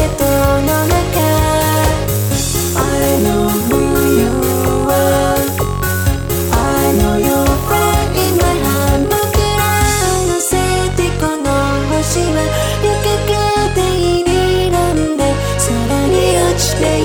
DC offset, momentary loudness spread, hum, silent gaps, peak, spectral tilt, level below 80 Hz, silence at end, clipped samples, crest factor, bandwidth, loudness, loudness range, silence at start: under 0.1%; 3 LU; none; none; 0 dBFS; -5 dB/octave; -24 dBFS; 0 s; under 0.1%; 12 dB; 19.5 kHz; -14 LUFS; 1 LU; 0 s